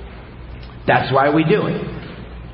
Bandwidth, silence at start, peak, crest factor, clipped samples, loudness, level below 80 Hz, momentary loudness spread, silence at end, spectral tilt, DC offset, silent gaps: 5.6 kHz; 0 s; -2 dBFS; 18 dB; under 0.1%; -17 LUFS; -38 dBFS; 22 LU; 0 s; -11.5 dB/octave; under 0.1%; none